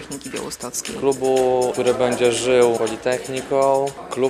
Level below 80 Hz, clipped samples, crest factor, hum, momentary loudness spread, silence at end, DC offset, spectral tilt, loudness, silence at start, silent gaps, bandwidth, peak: -54 dBFS; under 0.1%; 16 dB; none; 11 LU; 0 s; under 0.1%; -4 dB/octave; -20 LUFS; 0 s; none; 14 kHz; -4 dBFS